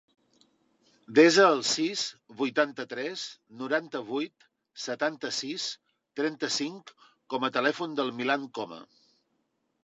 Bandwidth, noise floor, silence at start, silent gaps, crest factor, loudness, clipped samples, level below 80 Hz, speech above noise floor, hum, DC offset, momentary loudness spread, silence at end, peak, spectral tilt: 8.2 kHz; -76 dBFS; 1.1 s; none; 22 dB; -28 LUFS; under 0.1%; -84 dBFS; 48 dB; none; under 0.1%; 18 LU; 1 s; -8 dBFS; -3 dB/octave